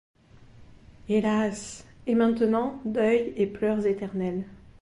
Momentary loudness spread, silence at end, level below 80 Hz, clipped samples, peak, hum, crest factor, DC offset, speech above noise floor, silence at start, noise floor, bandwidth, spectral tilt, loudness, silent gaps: 14 LU; 0.25 s; -56 dBFS; under 0.1%; -10 dBFS; none; 16 dB; under 0.1%; 26 dB; 0.6 s; -51 dBFS; 11.5 kHz; -6.5 dB/octave; -26 LUFS; none